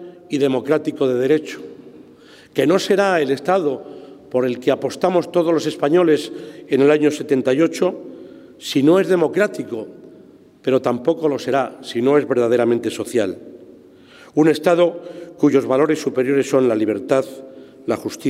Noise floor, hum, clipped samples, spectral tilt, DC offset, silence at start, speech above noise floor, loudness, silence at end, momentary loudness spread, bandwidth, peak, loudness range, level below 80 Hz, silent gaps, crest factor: -46 dBFS; none; under 0.1%; -6 dB/octave; under 0.1%; 0 s; 28 dB; -18 LUFS; 0 s; 16 LU; 15.5 kHz; -4 dBFS; 2 LU; -68 dBFS; none; 16 dB